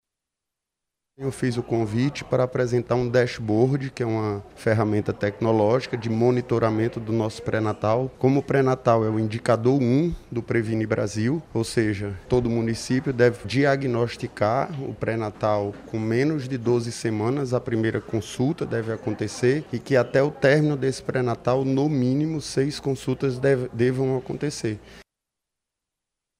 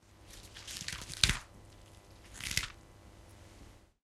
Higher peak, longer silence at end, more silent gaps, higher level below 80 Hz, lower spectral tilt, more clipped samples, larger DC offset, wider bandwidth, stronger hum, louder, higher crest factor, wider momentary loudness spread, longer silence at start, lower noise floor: second, -6 dBFS vs -2 dBFS; first, 1.35 s vs 0.25 s; neither; about the same, -52 dBFS vs -50 dBFS; first, -7 dB/octave vs -1.5 dB/octave; neither; neither; second, 12.5 kHz vs 16 kHz; neither; first, -24 LUFS vs -35 LUFS; second, 18 dB vs 38 dB; second, 7 LU vs 27 LU; first, 1.2 s vs 0.1 s; first, -85 dBFS vs -57 dBFS